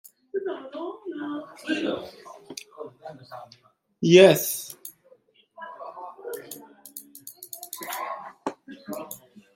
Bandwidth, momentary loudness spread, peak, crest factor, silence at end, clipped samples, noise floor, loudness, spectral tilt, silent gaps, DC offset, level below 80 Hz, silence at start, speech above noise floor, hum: 17 kHz; 24 LU; -2 dBFS; 26 dB; 0.4 s; under 0.1%; -59 dBFS; -24 LUFS; -4.5 dB/octave; none; under 0.1%; -74 dBFS; 0.35 s; 38 dB; none